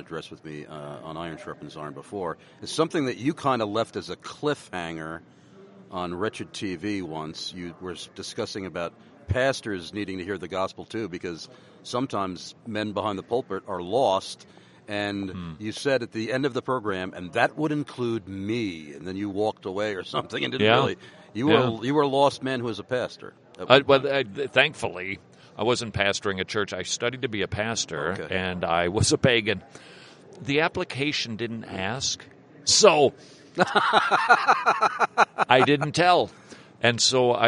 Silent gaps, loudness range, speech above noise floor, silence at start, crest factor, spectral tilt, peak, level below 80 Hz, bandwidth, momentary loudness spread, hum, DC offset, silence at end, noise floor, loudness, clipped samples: none; 11 LU; 24 dB; 0 s; 24 dB; -4 dB/octave; -2 dBFS; -58 dBFS; 11.5 kHz; 17 LU; none; under 0.1%; 0 s; -50 dBFS; -25 LUFS; under 0.1%